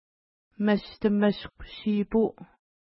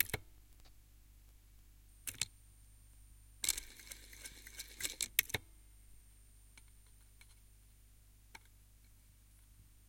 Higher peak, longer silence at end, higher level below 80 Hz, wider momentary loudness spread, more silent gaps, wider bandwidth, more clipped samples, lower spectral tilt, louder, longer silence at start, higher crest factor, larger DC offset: second, -10 dBFS vs -6 dBFS; first, 0.4 s vs 0 s; first, -54 dBFS vs -62 dBFS; second, 10 LU vs 27 LU; neither; second, 5.8 kHz vs 17 kHz; neither; first, -11 dB/octave vs -0.5 dB/octave; first, -27 LUFS vs -40 LUFS; first, 0.6 s vs 0 s; second, 18 dB vs 40 dB; neither